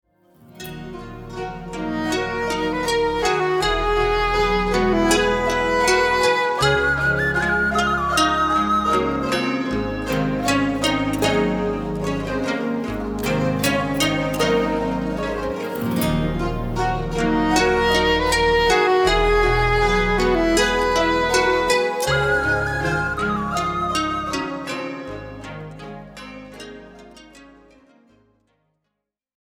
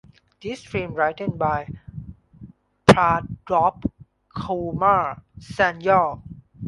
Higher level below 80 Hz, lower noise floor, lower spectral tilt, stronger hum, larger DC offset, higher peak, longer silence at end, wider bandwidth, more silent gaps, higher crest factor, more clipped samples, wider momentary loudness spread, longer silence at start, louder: first, -34 dBFS vs -46 dBFS; first, -79 dBFS vs -46 dBFS; second, -4.5 dB/octave vs -6 dB/octave; neither; neither; second, -4 dBFS vs 0 dBFS; first, 2.05 s vs 0 s; first, over 20 kHz vs 11.5 kHz; neither; second, 16 dB vs 22 dB; neither; second, 14 LU vs 20 LU; about the same, 0.55 s vs 0.45 s; about the same, -20 LUFS vs -21 LUFS